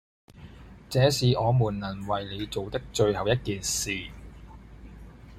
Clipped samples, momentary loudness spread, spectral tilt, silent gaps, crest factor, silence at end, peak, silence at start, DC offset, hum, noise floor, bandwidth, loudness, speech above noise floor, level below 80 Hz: under 0.1%; 25 LU; -5 dB/octave; none; 20 dB; 0 s; -8 dBFS; 0.35 s; under 0.1%; none; -47 dBFS; 15.5 kHz; -27 LUFS; 21 dB; -48 dBFS